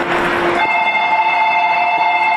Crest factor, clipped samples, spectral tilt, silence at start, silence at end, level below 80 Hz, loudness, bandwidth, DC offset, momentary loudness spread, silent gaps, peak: 10 dB; under 0.1%; -4 dB/octave; 0 s; 0 s; -48 dBFS; -14 LUFS; 13 kHz; under 0.1%; 2 LU; none; -4 dBFS